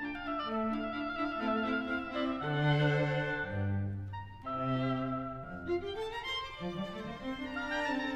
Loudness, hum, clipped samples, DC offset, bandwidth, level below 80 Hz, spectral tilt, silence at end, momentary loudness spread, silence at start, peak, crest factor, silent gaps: -35 LUFS; none; under 0.1%; under 0.1%; 8.8 kHz; -56 dBFS; -7 dB/octave; 0 s; 10 LU; 0 s; -16 dBFS; 18 dB; none